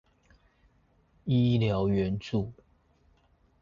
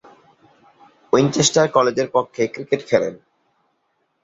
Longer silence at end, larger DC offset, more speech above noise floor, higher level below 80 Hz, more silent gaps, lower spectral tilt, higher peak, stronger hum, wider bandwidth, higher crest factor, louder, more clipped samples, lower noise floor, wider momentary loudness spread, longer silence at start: about the same, 1.1 s vs 1.05 s; neither; second, 39 dB vs 51 dB; first, -52 dBFS vs -58 dBFS; neither; first, -8.5 dB/octave vs -4 dB/octave; second, -14 dBFS vs -2 dBFS; neither; second, 7.2 kHz vs 8 kHz; about the same, 16 dB vs 20 dB; second, -28 LUFS vs -19 LUFS; neither; about the same, -66 dBFS vs -69 dBFS; first, 12 LU vs 9 LU; about the same, 1.25 s vs 1.15 s